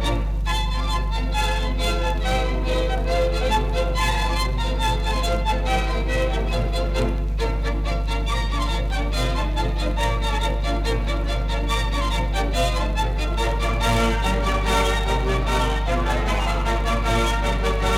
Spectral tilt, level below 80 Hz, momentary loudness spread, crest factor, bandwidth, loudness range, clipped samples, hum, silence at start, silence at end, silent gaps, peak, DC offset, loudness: -5 dB/octave; -22 dBFS; 4 LU; 12 dB; 14 kHz; 2 LU; under 0.1%; 50 Hz at -20 dBFS; 0 s; 0 s; none; -8 dBFS; under 0.1%; -23 LUFS